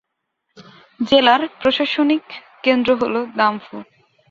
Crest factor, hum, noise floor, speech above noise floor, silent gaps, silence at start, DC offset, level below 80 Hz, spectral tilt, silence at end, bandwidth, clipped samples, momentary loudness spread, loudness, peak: 18 dB; none; -74 dBFS; 57 dB; none; 0.6 s; under 0.1%; -58 dBFS; -5 dB/octave; 0.5 s; 7.4 kHz; under 0.1%; 17 LU; -17 LUFS; -2 dBFS